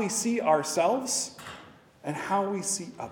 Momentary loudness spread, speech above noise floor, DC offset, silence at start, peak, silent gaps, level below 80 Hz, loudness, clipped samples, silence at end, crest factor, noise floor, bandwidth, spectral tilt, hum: 17 LU; 23 dB; under 0.1%; 0 s; -10 dBFS; none; -72 dBFS; -28 LUFS; under 0.1%; 0 s; 20 dB; -51 dBFS; 18 kHz; -3 dB/octave; none